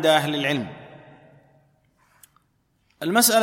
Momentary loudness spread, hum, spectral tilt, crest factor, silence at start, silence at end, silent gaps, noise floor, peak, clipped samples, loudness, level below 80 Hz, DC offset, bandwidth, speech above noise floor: 24 LU; none; -3 dB/octave; 20 dB; 0 s; 0 s; none; -67 dBFS; -4 dBFS; under 0.1%; -22 LUFS; -68 dBFS; under 0.1%; 16.5 kHz; 47 dB